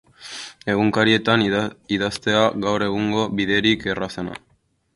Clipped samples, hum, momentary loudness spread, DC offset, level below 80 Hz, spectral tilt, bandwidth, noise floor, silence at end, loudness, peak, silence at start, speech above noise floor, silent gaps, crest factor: under 0.1%; none; 15 LU; under 0.1%; -52 dBFS; -5 dB/octave; 11.5 kHz; -64 dBFS; 0.6 s; -20 LUFS; -2 dBFS; 0.2 s; 44 dB; none; 20 dB